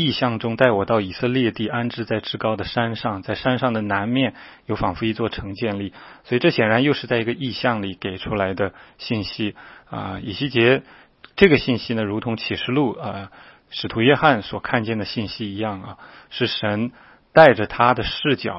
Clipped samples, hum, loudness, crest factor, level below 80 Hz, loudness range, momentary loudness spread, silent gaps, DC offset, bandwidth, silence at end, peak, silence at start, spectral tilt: under 0.1%; none; -21 LUFS; 22 dB; -48 dBFS; 4 LU; 13 LU; none; under 0.1%; 5.8 kHz; 0 s; 0 dBFS; 0 s; -8.5 dB/octave